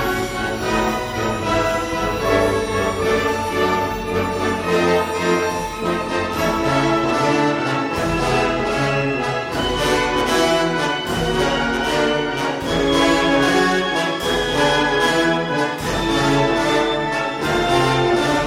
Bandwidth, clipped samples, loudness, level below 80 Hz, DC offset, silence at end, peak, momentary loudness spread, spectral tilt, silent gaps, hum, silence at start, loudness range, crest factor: 16.5 kHz; under 0.1%; -18 LUFS; -36 dBFS; under 0.1%; 0 s; -4 dBFS; 5 LU; -4.5 dB/octave; none; none; 0 s; 2 LU; 16 dB